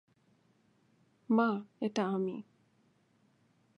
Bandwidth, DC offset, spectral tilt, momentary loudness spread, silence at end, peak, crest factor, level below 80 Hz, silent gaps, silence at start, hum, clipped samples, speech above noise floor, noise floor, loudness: 7.8 kHz; under 0.1%; -7 dB/octave; 9 LU; 1.35 s; -16 dBFS; 22 dB; -88 dBFS; none; 1.3 s; none; under 0.1%; 39 dB; -71 dBFS; -33 LUFS